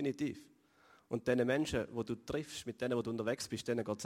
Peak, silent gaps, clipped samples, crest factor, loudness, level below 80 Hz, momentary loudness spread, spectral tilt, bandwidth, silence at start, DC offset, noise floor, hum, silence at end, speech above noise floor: -20 dBFS; none; under 0.1%; 18 dB; -38 LUFS; -64 dBFS; 8 LU; -5 dB/octave; 16 kHz; 0 s; under 0.1%; -67 dBFS; none; 0 s; 30 dB